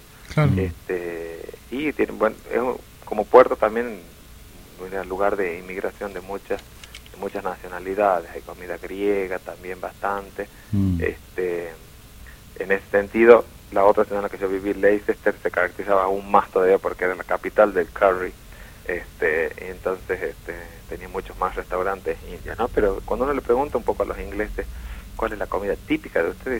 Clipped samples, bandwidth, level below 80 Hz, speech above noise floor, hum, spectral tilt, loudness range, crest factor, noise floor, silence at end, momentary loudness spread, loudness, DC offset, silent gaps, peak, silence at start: under 0.1%; 16.5 kHz; -42 dBFS; 21 dB; none; -7 dB/octave; 8 LU; 24 dB; -44 dBFS; 0 s; 16 LU; -23 LUFS; under 0.1%; none; 0 dBFS; 0.15 s